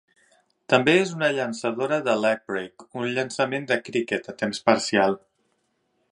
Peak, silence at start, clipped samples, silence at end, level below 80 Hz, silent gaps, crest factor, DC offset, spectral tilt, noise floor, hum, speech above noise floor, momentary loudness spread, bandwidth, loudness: -2 dBFS; 0.7 s; under 0.1%; 0.95 s; -68 dBFS; none; 24 dB; under 0.1%; -4.5 dB/octave; -71 dBFS; none; 48 dB; 9 LU; 11.5 kHz; -24 LUFS